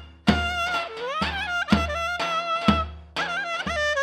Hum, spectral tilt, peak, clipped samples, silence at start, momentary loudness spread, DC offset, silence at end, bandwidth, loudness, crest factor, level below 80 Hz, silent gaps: none; -5 dB/octave; -6 dBFS; under 0.1%; 0 s; 5 LU; under 0.1%; 0 s; 14 kHz; -25 LUFS; 20 dB; -38 dBFS; none